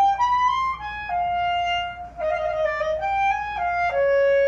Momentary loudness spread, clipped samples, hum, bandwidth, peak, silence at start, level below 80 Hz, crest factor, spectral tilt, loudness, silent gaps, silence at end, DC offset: 7 LU; under 0.1%; none; 7.4 kHz; -12 dBFS; 0 s; -46 dBFS; 10 dB; -3 dB/octave; -23 LUFS; none; 0 s; under 0.1%